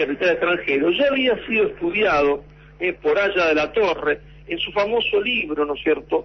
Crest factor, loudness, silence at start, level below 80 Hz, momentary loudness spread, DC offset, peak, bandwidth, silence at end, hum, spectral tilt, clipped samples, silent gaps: 12 dB; -20 LUFS; 0 s; -48 dBFS; 7 LU; under 0.1%; -8 dBFS; 6.4 kHz; 0 s; none; -5 dB/octave; under 0.1%; none